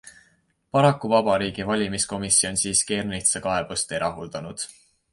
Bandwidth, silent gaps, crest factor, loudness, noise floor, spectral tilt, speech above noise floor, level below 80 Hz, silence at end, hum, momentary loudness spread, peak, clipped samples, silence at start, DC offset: 11.5 kHz; none; 20 dB; -22 LUFS; -65 dBFS; -3 dB/octave; 41 dB; -52 dBFS; 0.45 s; none; 14 LU; -4 dBFS; under 0.1%; 0.05 s; under 0.1%